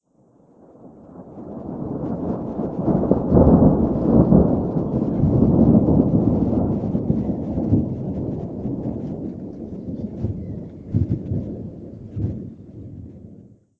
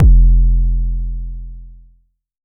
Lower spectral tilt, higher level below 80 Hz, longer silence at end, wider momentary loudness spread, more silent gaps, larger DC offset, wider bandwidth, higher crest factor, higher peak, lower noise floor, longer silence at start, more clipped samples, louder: second, -13 dB/octave vs -16 dB/octave; second, -34 dBFS vs -12 dBFS; second, 0.35 s vs 0.75 s; about the same, 19 LU vs 20 LU; neither; neither; first, 2.7 kHz vs 0.7 kHz; first, 20 dB vs 12 dB; about the same, 0 dBFS vs 0 dBFS; about the same, -56 dBFS vs -54 dBFS; first, 0.8 s vs 0 s; neither; second, -20 LUFS vs -17 LUFS